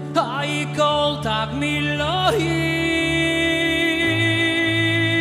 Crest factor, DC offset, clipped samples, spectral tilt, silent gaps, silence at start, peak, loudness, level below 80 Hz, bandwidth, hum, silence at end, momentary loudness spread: 16 dB; under 0.1%; under 0.1%; -5 dB/octave; none; 0 s; -4 dBFS; -19 LUFS; -42 dBFS; 14.5 kHz; none; 0 s; 5 LU